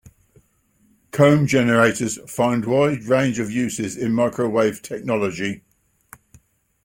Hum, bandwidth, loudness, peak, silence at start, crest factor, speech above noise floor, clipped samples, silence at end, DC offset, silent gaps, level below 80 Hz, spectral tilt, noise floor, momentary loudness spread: none; 16.5 kHz; -20 LUFS; -2 dBFS; 1.15 s; 20 dB; 42 dB; under 0.1%; 1.3 s; under 0.1%; none; -56 dBFS; -5.5 dB/octave; -61 dBFS; 11 LU